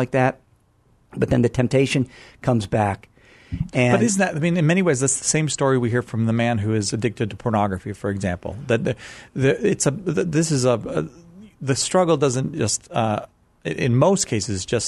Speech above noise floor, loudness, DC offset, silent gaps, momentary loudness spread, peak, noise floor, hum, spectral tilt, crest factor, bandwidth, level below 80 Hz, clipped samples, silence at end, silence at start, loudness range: 38 dB; -21 LUFS; under 0.1%; none; 10 LU; -4 dBFS; -59 dBFS; none; -5 dB/octave; 18 dB; 12 kHz; -48 dBFS; under 0.1%; 0 s; 0 s; 3 LU